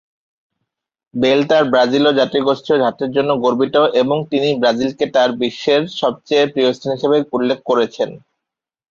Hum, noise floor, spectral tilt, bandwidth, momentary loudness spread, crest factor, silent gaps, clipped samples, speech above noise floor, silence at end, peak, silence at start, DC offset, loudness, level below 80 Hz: none; -82 dBFS; -5.5 dB/octave; 7.4 kHz; 6 LU; 14 dB; none; under 0.1%; 67 dB; 0.75 s; -2 dBFS; 1.15 s; under 0.1%; -16 LUFS; -60 dBFS